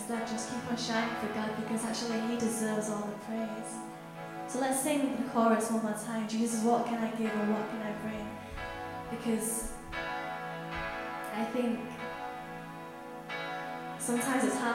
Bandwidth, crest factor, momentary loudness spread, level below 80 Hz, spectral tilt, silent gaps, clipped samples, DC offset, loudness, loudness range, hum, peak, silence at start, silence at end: 16 kHz; 20 dB; 12 LU; -58 dBFS; -4 dB/octave; none; under 0.1%; under 0.1%; -34 LUFS; 6 LU; none; -14 dBFS; 0 s; 0 s